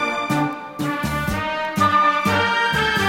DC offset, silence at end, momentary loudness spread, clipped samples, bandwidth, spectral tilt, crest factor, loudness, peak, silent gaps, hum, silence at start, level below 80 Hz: under 0.1%; 0 s; 8 LU; under 0.1%; 16.5 kHz; -4.5 dB/octave; 16 dB; -19 LUFS; -4 dBFS; none; none; 0 s; -40 dBFS